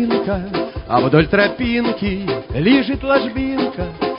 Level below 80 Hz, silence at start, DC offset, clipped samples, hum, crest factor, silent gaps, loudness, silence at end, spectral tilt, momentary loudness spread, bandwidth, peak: -34 dBFS; 0 s; under 0.1%; under 0.1%; none; 16 dB; none; -17 LUFS; 0 s; -11.5 dB/octave; 9 LU; 5.4 kHz; -2 dBFS